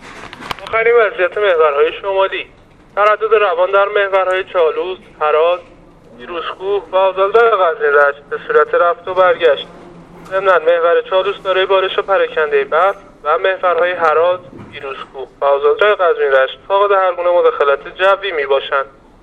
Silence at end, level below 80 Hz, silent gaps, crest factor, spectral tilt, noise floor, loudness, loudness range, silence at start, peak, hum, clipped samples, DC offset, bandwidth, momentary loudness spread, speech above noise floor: 0.35 s; -50 dBFS; none; 14 dB; -4.5 dB/octave; -36 dBFS; -14 LUFS; 2 LU; 0 s; 0 dBFS; none; under 0.1%; under 0.1%; 8.8 kHz; 12 LU; 23 dB